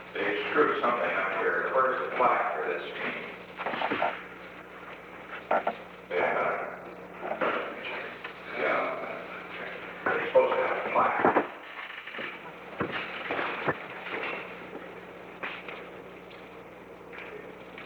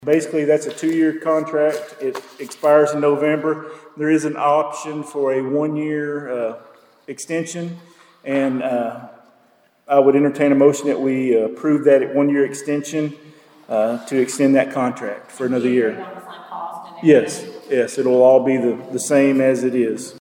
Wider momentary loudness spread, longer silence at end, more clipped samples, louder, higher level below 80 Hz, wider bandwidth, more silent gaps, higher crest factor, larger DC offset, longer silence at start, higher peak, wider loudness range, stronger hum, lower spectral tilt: about the same, 18 LU vs 16 LU; about the same, 0 s vs 0 s; neither; second, -30 LUFS vs -18 LUFS; first, -68 dBFS vs -74 dBFS; first, over 20 kHz vs 17 kHz; neither; about the same, 20 dB vs 18 dB; neither; about the same, 0 s vs 0 s; second, -10 dBFS vs -2 dBFS; about the same, 8 LU vs 8 LU; neither; about the same, -6 dB/octave vs -6 dB/octave